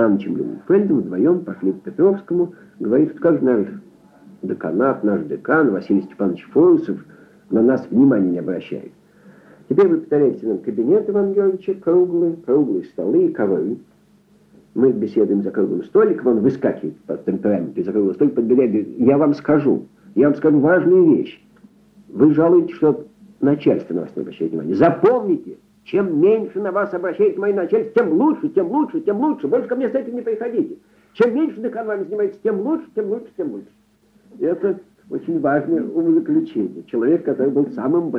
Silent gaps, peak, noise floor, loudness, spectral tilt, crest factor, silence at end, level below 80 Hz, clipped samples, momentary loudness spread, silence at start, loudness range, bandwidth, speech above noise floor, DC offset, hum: none; -2 dBFS; -56 dBFS; -18 LUFS; -10 dB/octave; 16 dB; 0 s; -64 dBFS; under 0.1%; 11 LU; 0 s; 5 LU; 5.6 kHz; 38 dB; under 0.1%; none